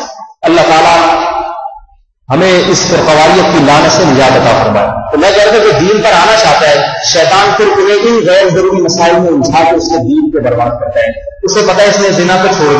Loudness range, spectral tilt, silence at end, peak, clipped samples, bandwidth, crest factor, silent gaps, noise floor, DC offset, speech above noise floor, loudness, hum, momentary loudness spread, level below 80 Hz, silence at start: 3 LU; -4 dB/octave; 0 s; 0 dBFS; 0.5%; 11 kHz; 8 dB; none; -42 dBFS; under 0.1%; 35 dB; -7 LUFS; none; 7 LU; -36 dBFS; 0 s